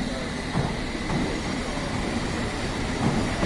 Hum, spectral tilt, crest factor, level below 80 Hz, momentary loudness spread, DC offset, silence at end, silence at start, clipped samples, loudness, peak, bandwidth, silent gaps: none; -5 dB/octave; 18 dB; -36 dBFS; 4 LU; under 0.1%; 0 s; 0 s; under 0.1%; -28 LUFS; -10 dBFS; 11.5 kHz; none